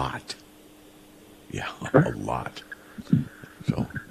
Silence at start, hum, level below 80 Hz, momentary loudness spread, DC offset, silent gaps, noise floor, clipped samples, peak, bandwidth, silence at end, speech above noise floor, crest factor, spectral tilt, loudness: 0 s; none; -52 dBFS; 18 LU; under 0.1%; none; -51 dBFS; under 0.1%; -4 dBFS; 14.5 kHz; 0.05 s; 25 dB; 26 dB; -7 dB/octave; -28 LUFS